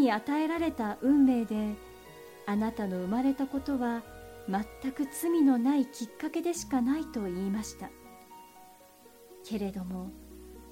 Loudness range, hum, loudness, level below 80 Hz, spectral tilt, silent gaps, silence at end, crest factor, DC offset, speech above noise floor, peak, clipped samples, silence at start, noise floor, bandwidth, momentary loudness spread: 8 LU; none; -31 LUFS; -58 dBFS; -5.5 dB/octave; none; 0 s; 16 dB; under 0.1%; 26 dB; -16 dBFS; under 0.1%; 0 s; -56 dBFS; 16.5 kHz; 24 LU